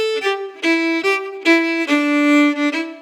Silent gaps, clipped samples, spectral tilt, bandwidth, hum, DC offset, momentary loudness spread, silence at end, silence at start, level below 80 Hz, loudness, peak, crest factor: none; under 0.1%; -1.5 dB/octave; 13.5 kHz; none; under 0.1%; 6 LU; 0 s; 0 s; -90 dBFS; -16 LUFS; -2 dBFS; 14 dB